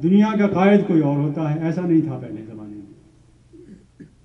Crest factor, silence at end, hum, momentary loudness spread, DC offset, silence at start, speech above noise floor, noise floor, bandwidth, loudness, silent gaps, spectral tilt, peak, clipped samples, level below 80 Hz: 16 dB; 0.2 s; none; 21 LU; under 0.1%; 0 s; 34 dB; -52 dBFS; 6.2 kHz; -18 LUFS; none; -9 dB/octave; -4 dBFS; under 0.1%; -56 dBFS